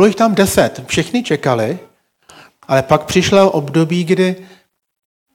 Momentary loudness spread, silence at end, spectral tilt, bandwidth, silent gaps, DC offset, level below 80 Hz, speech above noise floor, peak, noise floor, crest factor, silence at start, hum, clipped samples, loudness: 7 LU; 0.9 s; -5 dB/octave; 17 kHz; none; under 0.1%; -46 dBFS; 34 dB; 0 dBFS; -48 dBFS; 16 dB; 0 s; none; 0.3%; -14 LUFS